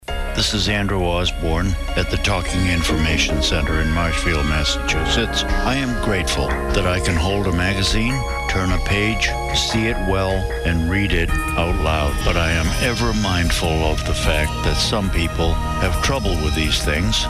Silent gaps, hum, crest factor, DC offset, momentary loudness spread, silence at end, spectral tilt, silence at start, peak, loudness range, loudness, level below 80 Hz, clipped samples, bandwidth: none; none; 14 dB; under 0.1%; 3 LU; 0 s; -4.5 dB/octave; 0 s; -4 dBFS; 1 LU; -19 LUFS; -24 dBFS; under 0.1%; 15.5 kHz